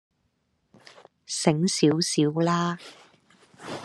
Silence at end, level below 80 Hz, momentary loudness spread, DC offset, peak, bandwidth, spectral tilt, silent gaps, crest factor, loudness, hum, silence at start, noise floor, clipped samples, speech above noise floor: 0 s; -70 dBFS; 17 LU; under 0.1%; -4 dBFS; 12.5 kHz; -5 dB/octave; none; 22 dB; -24 LUFS; none; 1.3 s; -73 dBFS; under 0.1%; 49 dB